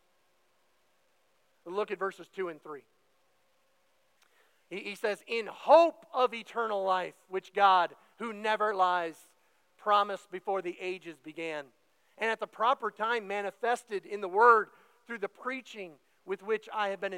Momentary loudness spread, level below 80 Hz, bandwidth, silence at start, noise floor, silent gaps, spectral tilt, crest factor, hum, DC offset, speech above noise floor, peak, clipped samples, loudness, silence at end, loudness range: 17 LU; under -90 dBFS; 16 kHz; 1.65 s; -73 dBFS; none; -4 dB/octave; 24 dB; none; under 0.1%; 42 dB; -8 dBFS; under 0.1%; -30 LUFS; 0 s; 13 LU